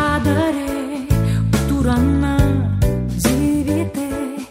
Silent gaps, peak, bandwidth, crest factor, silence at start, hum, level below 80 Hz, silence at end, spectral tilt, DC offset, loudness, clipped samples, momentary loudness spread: none; -2 dBFS; 16 kHz; 14 dB; 0 s; none; -28 dBFS; 0 s; -6.5 dB/octave; under 0.1%; -18 LUFS; under 0.1%; 7 LU